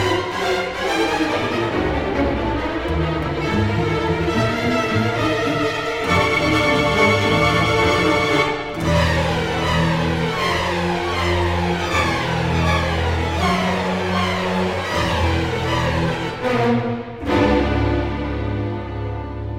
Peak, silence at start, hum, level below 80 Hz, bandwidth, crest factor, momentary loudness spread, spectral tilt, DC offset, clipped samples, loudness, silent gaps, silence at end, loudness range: -4 dBFS; 0 s; none; -32 dBFS; 16 kHz; 16 dB; 6 LU; -5.5 dB/octave; under 0.1%; under 0.1%; -19 LUFS; none; 0 s; 4 LU